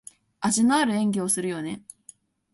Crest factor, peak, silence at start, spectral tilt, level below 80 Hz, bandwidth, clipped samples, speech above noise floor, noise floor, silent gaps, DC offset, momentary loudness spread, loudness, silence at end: 18 dB; -8 dBFS; 0.4 s; -4 dB/octave; -66 dBFS; 12 kHz; under 0.1%; 30 dB; -54 dBFS; none; under 0.1%; 13 LU; -24 LUFS; 0.75 s